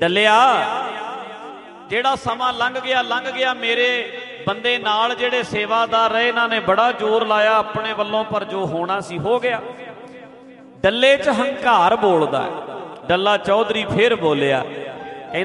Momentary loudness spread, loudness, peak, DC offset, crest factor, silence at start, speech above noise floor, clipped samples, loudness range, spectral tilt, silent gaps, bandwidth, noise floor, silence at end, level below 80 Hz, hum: 15 LU; -18 LUFS; -2 dBFS; under 0.1%; 18 dB; 0 s; 24 dB; under 0.1%; 3 LU; -4.5 dB/octave; none; 11.5 kHz; -42 dBFS; 0 s; -56 dBFS; none